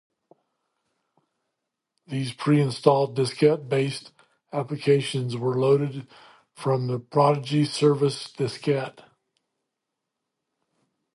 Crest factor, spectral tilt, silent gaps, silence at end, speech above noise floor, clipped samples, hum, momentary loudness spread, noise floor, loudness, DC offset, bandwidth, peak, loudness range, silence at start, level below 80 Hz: 22 dB; -6.5 dB/octave; none; 2.25 s; 60 dB; under 0.1%; none; 11 LU; -83 dBFS; -24 LUFS; under 0.1%; 11.5 kHz; -2 dBFS; 3 LU; 2.1 s; -72 dBFS